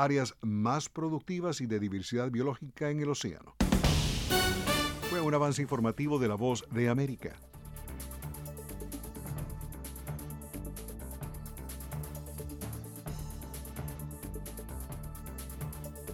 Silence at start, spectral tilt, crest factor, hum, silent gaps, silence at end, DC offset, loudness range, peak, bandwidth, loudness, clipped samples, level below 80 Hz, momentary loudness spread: 0 s; -5 dB/octave; 22 dB; none; none; 0 s; under 0.1%; 12 LU; -12 dBFS; 19.5 kHz; -35 LUFS; under 0.1%; -44 dBFS; 14 LU